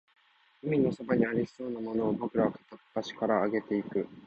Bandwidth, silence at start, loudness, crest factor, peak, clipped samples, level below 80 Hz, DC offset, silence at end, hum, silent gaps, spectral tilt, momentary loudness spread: 8.4 kHz; 0.65 s; -31 LUFS; 18 dB; -12 dBFS; under 0.1%; -66 dBFS; under 0.1%; 0 s; none; none; -8 dB/octave; 10 LU